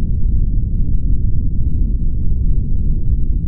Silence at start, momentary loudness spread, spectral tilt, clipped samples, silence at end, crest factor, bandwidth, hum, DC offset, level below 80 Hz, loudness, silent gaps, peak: 0 s; 1 LU; -19.5 dB/octave; under 0.1%; 0 s; 10 dB; 0.7 kHz; none; under 0.1%; -14 dBFS; -20 LUFS; none; -4 dBFS